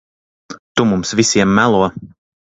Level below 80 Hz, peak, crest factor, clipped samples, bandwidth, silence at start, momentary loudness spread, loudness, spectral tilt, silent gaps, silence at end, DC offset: -46 dBFS; 0 dBFS; 16 dB; under 0.1%; 8.4 kHz; 0.5 s; 9 LU; -14 LUFS; -4.5 dB/octave; 0.59-0.75 s; 0.5 s; under 0.1%